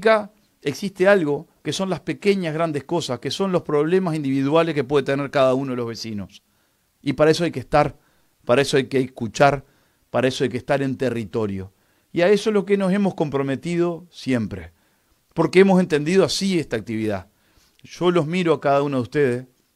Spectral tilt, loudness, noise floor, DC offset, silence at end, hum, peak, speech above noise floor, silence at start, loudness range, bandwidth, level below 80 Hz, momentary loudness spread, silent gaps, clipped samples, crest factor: -6 dB/octave; -21 LUFS; -65 dBFS; under 0.1%; 0.3 s; none; -2 dBFS; 45 dB; 0 s; 2 LU; 13.5 kHz; -54 dBFS; 11 LU; none; under 0.1%; 20 dB